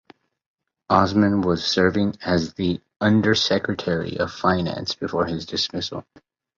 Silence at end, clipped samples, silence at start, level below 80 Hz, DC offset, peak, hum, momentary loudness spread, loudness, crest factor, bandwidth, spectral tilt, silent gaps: 0.55 s; under 0.1%; 0.9 s; -46 dBFS; under 0.1%; -2 dBFS; none; 8 LU; -22 LUFS; 20 dB; 7.6 kHz; -5.5 dB/octave; 2.96-3.00 s